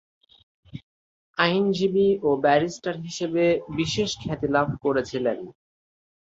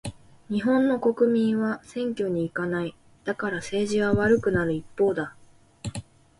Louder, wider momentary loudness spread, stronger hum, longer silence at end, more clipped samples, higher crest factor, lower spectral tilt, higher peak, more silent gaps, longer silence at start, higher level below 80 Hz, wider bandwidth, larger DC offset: about the same, -24 LUFS vs -25 LUFS; about the same, 16 LU vs 15 LU; neither; first, 0.9 s vs 0.4 s; neither; first, 22 dB vs 16 dB; about the same, -5.5 dB/octave vs -6.5 dB/octave; first, -4 dBFS vs -10 dBFS; first, 0.83-1.34 s vs none; first, 0.75 s vs 0.05 s; about the same, -56 dBFS vs -52 dBFS; second, 8 kHz vs 11.5 kHz; neither